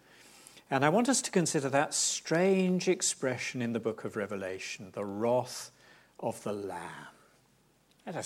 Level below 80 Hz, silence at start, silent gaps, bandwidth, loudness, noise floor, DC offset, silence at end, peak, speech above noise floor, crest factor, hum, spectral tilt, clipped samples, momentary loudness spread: -78 dBFS; 0.55 s; none; 16.5 kHz; -31 LUFS; -67 dBFS; under 0.1%; 0 s; -12 dBFS; 36 dB; 20 dB; none; -4 dB/octave; under 0.1%; 14 LU